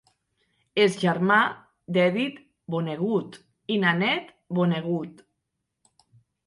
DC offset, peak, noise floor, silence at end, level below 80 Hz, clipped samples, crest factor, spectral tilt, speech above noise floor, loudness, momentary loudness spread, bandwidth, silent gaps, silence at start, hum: under 0.1%; -8 dBFS; -81 dBFS; 1.35 s; -72 dBFS; under 0.1%; 18 dB; -6 dB/octave; 57 dB; -25 LUFS; 15 LU; 11.5 kHz; none; 0.75 s; none